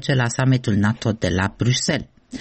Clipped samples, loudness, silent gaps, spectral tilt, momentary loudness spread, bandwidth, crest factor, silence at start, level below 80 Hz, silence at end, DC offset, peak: under 0.1%; -20 LUFS; none; -5 dB/octave; 4 LU; 8.8 kHz; 12 dB; 0 s; -46 dBFS; 0 s; 0.1%; -8 dBFS